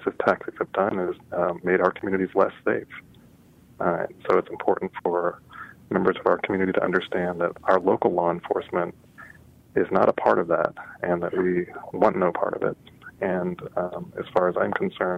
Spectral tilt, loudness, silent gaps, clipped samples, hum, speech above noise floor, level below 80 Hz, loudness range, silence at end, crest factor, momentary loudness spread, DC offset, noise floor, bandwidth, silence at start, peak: -8 dB/octave; -25 LUFS; none; under 0.1%; none; 29 dB; -62 dBFS; 3 LU; 0 s; 18 dB; 9 LU; under 0.1%; -53 dBFS; 7.6 kHz; 0 s; -6 dBFS